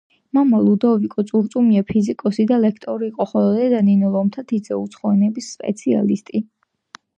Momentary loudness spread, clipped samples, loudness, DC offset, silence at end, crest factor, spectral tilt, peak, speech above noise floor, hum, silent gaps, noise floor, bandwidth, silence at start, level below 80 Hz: 10 LU; under 0.1%; -18 LUFS; under 0.1%; 0.8 s; 14 dB; -8 dB/octave; -4 dBFS; 29 dB; none; none; -46 dBFS; 8.8 kHz; 0.35 s; -60 dBFS